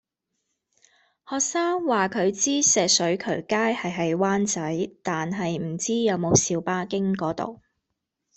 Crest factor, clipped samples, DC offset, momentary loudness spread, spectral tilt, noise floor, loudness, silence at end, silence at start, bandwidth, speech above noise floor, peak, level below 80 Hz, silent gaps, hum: 20 dB; under 0.1%; under 0.1%; 9 LU; -3.5 dB/octave; -81 dBFS; -24 LUFS; 0.8 s; 1.3 s; 8.4 kHz; 57 dB; -4 dBFS; -62 dBFS; none; none